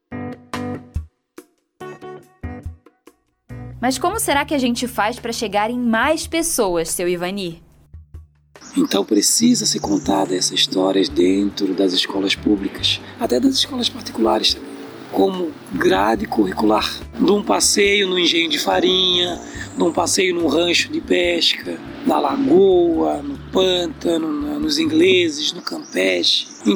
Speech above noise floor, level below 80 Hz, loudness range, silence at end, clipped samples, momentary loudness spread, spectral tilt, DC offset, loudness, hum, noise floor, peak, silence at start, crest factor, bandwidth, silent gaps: 35 dB; -44 dBFS; 6 LU; 0 s; under 0.1%; 15 LU; -3 dB/octave; under 0.1%; -18 LUFS; none; -53 dBFS; -4 dBFS; 0.1 s; 16 dB; over 20 kHz; none